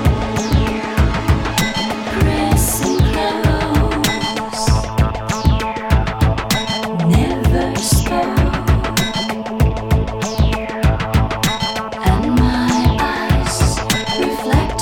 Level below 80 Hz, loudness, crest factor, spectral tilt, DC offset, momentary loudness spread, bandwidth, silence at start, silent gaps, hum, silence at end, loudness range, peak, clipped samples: -22 dBFS; -17 LUFS; 14 dB; -5 dB/octave; under 0.1%; 4 LU; 19 kHz; 0 s; none; none; 0 s; 1 LU; 0 dBFS; under 0.1%